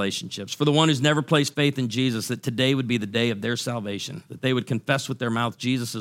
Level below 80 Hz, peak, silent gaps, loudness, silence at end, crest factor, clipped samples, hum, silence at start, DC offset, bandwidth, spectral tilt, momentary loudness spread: -66 dBFS; -4 dBFS; none; -24 LUFS; 0 s; 20 dB; under 0.1%; none; 0 s; under 0.1%; 16.5 kHz; -5 dB/octave; 9 LU